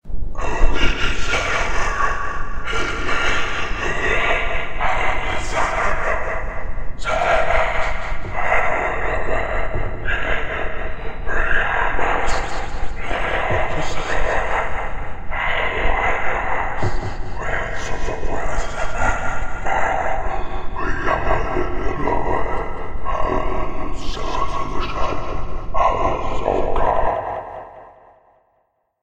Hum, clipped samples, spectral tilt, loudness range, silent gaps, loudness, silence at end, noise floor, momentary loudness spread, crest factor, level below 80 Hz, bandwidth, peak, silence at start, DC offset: none; under 0.1%; -4.5 dB/octave; 3 LU; none; -22 LUFS; 1.1 s; -66 dBFS; 9 LU; 16 dB; -24 dBFS; 8.4 kHz; 0 dBFS; 0.05 s; under 0.1%